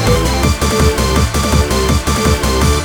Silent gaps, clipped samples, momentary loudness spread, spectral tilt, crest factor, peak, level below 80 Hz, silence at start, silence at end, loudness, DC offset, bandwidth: none; under 0.1%; 1 LU; -4.5 dB/octave; 12 dB; -2 dBFS; -18 dBFS; 0 s; 0 s; -13 LUFS; under 0.1%; over 20 kHz